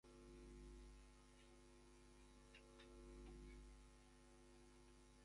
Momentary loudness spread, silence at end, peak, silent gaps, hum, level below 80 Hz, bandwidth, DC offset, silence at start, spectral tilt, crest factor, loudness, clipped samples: 7 LU; 0 s; -50 dBFS; none; none; -66 dBFS; 11 kHz; under 0.1%; 0.05 s; -5 dB/octave; 14 dB; -66 LUFS; under 0.1%